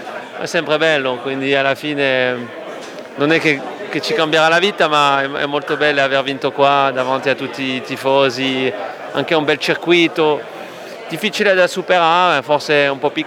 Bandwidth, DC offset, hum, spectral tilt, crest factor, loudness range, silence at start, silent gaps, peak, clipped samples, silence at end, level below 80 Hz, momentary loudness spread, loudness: 16.5 kHz; under 0.1%; none; -4 dB/octave; 16 dB; 3 LU; 0 s; none; 0 dBFS; under 0.1%; 0 s; -68 dBFS; 12 LU; -15 LUFS